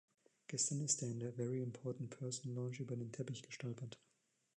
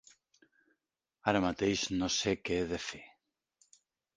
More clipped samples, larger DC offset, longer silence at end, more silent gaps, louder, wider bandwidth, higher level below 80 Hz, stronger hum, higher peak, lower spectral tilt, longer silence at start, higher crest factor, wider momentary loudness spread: neither; neither; second, 0.6 s vs 1.1 s; neither; second, -43 LUFS vs -33 LUFS; about the same, 10.5 kHz vs 10 kHz; second, -84 dBFS vs -58 dBFS; neither; second, -22 dBFS vs -10 dBFS; about the same, -4.5 dB/octave vs -4 dB/octave; second, 0.5 s vs 1.25 s; about the same, 22 dB vs 26 dB; first, 11 LU vs 8 LU